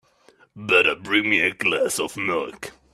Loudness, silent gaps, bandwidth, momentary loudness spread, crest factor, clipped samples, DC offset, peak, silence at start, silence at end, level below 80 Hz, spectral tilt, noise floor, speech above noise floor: -20 LUFS; none; 15 kHz; 15 LU; 18 dB; under 0.1%; under 0.1%; -4 dBFS; 0.55 s; 0.25 s; -62 dBFS; -2.5 dB/octave; -57 dBFS; 35 dB